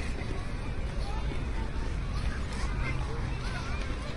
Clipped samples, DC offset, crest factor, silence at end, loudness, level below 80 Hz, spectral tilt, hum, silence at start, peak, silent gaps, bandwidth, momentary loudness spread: under 0.1%; under 0.1%; 12 dB; 0 s; -35 LUFS; -34 dBFS; -6 dB/octave; none; 0 s; -20 dBFS; none; 11.5 kHz; 3 LU